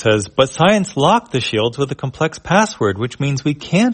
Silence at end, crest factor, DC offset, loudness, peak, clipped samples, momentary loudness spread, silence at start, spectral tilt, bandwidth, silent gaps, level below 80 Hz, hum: 0 s; 16 dB; under 0.1%; -17 LUFS; 0 dBFS; under 0.1%; 7 LU; 0 s; -5 dB/octave; 8.8 kHz; none; -48 dBFS; none